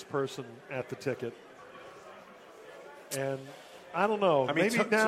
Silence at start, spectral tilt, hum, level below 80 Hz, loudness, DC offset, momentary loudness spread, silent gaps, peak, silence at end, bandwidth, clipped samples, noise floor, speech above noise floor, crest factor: 0 s; -4.5 dB/octave; none; -76 dBFS; -31 LUFS; under 0.1%; 24 LU; none; -12 dBFS; 0 s; 15.5 kHz; under 0.1%; -52 dBFS; 21 dB; 20 dB